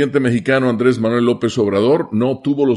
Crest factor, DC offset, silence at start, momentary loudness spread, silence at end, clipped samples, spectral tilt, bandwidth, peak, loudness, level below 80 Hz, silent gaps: 14 dB; under 0.1%; 0 s; 3 LU; 0 s; under 0.1%; -7 dB/octave; 11 kHz; -2 dBFS; -16 LUFS; -56 dBFS; none